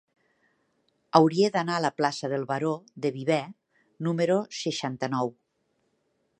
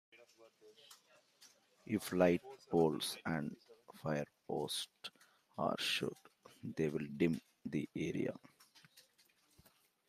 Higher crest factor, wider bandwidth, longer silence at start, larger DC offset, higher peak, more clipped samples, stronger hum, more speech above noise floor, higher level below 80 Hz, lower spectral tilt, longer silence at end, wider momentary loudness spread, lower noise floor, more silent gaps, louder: about the same, 24 dB vs 24 dB; second, 10.5 kHz vs 15.5 kHz; first, 1.15 s vs 0.15 s; neither; first, -4 dBFS vs -16 dBFS; neither; neither; first, 48 dB vs 34 dB; about the same, -76 dBFS vs -76 dBFS; about the same, -5.5 dB/octave vs -5 dB/octave; about the same, 1.1 s vs 1.1 s; second, 9 LU vs 23 LU; about the same, -74 dBFS vs -73 dBFS; neither; first, -27 LUFS vs -39 LUFS